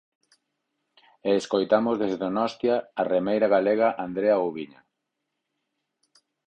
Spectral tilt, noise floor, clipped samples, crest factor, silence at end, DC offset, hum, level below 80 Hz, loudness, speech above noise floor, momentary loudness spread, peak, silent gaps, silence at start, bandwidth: -6 dB/octave; -81 dBFS; under 0.1%; 18 dB; 1.8 s; under 0.1%; none; -68 dBFS; -24 LUFS; 58 dB; 7 LU; -8 dBFS; none; 1.25 s; 8.8 kHz